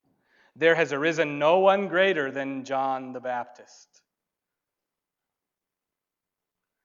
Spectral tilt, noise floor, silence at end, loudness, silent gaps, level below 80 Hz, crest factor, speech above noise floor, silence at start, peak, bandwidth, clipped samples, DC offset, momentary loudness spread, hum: -5 dB/octave; -88 dBFS; 3.2 s; -24 LUFS; none; -86 dBFS; 22 dB; 63 dB; 0.6 s; -6 dBFS; 7.6 kHz; under 0.1%; under 0.1%; 12 LU; none